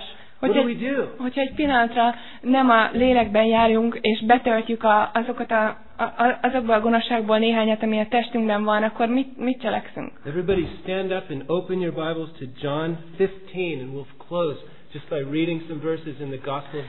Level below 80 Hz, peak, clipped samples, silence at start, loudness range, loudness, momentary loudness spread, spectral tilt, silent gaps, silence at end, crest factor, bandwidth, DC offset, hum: -50 dBFS; -2 dBFS; under 0.1%; 0 s; 9 LU; -22 LUFS; 12 LU; -9.5 dB/octave; none; 0 s; 20 dB; 4.2 kHz; 1%; none